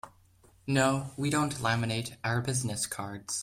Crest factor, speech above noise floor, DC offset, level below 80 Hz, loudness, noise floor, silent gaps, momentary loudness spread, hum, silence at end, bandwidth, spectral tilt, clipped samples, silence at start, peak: 18 dB; 31 dB; under 0.1%; -62 dBFS; -30 LUFS; -61 dBFS; none; 7 LU; none; 0 s; 16 kHz; -4.5 dB/octave; under 0.1%; 0.05 s; -12 dBFS